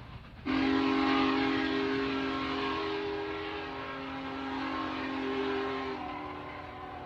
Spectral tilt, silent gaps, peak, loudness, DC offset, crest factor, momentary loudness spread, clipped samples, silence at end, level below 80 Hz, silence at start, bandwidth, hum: -6 dB/octave; none; -16 dBFS; -33 LUFS; under 0.1%; 16 dB; 13 LU; under 0.1%; 0 s; -56 dBFS; 0 s; 7.6 kHz; none